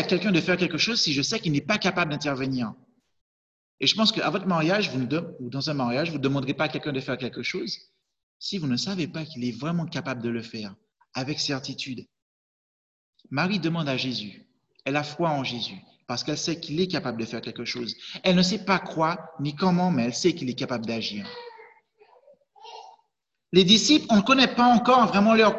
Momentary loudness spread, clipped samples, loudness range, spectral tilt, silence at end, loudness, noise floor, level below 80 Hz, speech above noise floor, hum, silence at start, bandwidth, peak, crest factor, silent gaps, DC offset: 15 LU; under 0.1%; 8 LU; -4.5 dB/octave; 0 s; -24 LUFS; -80 dBFS; -62 dBFS; 55 dB; none; 0 s; 8.2 kHz; -4 dBFS; 20 dB; 3.21-3.78 s, 8.23-8.40 s, 12.22-13.13 s; under 0.1%